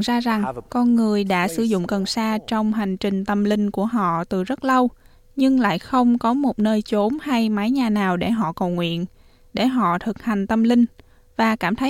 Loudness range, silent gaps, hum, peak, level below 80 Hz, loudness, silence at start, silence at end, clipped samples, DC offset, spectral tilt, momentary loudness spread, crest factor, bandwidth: 2 LU; none; none; -6 dBFS; -50 dBFS; -21 LUFS; 0 s; 0 s; under 0.1%; under 0.1%; -6 dB/octave; 6 LU; 14 dB; 14.5 kHz